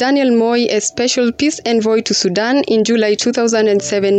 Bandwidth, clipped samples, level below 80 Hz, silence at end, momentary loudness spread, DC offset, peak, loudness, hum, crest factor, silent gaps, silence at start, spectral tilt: 9.2 kHz; under 0.1%; -56 dBFS; 0 s; 3 LU; under 0.1%; -4 dBFS; -14 LUFS; none; 8 dB; none; 0 s; -3.5 dB/octave